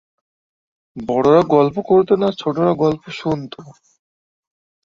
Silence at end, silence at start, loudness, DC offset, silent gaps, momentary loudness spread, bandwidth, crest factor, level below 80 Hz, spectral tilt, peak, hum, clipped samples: 1.15 s; 0.95 s; -17 LUFS; under 0.1%; none; 14 LU; 7.6 kHz; 16 dB; -54 dBFS; -8 dB/octave; -2 dBFS; none; under 0.1%